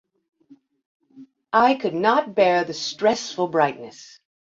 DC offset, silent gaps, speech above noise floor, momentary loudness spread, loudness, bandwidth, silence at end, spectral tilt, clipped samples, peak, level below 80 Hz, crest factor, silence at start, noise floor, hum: under 0.1%; none; 34 dB; 7 LU; -21 LUFS; 7.8 kHz; 0.55 s; -4 dB/octave; under 0.1%; -4 dBFS; -68 dBFS; 20 dB; 1.15 s; -54 dBFS; none